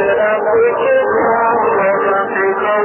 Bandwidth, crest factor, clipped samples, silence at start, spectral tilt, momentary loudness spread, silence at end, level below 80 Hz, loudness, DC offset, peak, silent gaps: 3.2 kHz; 10 dB; under 0.1%; 0 s; 1.5 dB/octave; 2 LU; 0 s; -52 dBFS; -13 LUFS; under 0.1%; -4 dBFS; none